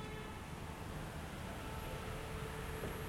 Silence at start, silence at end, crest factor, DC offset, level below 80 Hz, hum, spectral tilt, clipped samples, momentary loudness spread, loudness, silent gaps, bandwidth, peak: 0 s; 0 s; 14 dB; under 0.1%; -52 dBFS; none; -5 dB/octave; under 0.1%; 3 LU; -46 LUFS; none; 16.5 kHz; -30 dBFS